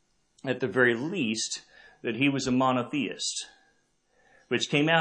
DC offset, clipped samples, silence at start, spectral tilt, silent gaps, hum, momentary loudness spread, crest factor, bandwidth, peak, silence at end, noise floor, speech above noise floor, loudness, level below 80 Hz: under 0.1%; under 0.1%; 0.45 s; -4 dB/octave; none; none; 12 LU; 22 dB; 9.8 kHz; -8 dBFS; 0 s; -69 dBFS; 42 dB; -28 LUFS; -68 dBFS